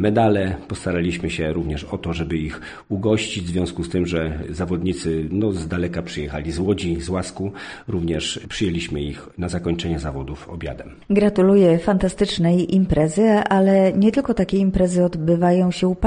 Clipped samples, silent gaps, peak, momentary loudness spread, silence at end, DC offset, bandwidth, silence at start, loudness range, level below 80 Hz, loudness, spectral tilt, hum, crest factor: under 0.1%; none; -4 dBFS; 12 LU; 0 s; under 0.1%; 10 kHz; 0 s; 8 LU; -38 dBFS; -20 LUFS; -6.5 dB/octave; none; 16 dB